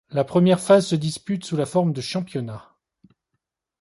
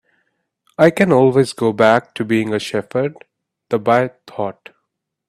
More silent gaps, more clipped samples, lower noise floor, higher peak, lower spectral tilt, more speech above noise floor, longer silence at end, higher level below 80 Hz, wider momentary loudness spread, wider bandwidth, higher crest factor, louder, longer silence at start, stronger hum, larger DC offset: neither; neither; first, -79 dBFS vs -74 dBFS; second, -4 dBFS vs 0 dBFS; about the same, -6.5 dB/octave vs -6.5 dB/octave; about the same, 58 dB vs 59 dB; first, 1.2 s vs 0.75 s; about the same, -62 dBFS vs -58 dBFS; about the same, 14 LU vs 13 LU; second, 11.5 kHz vs 14 kHz; about the same, 18 dB vs 18 dB; second, -21 LUFS vs -16 LUFS; second, 0.1 s vs 0.8 s; neither; neither